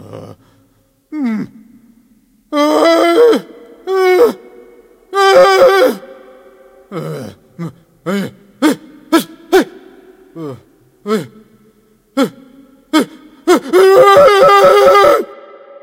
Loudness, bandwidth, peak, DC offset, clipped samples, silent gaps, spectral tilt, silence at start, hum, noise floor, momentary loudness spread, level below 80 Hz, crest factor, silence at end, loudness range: -11 LUFS; 16.5 kHz; 0 dBFS; under 0.1%; 0.1%; none; -4.5 dB/octave; 0.1 s; none; -54 dBFS; 22 LU; -52 dBFS; 12 dB; 0.5 s; 12 LU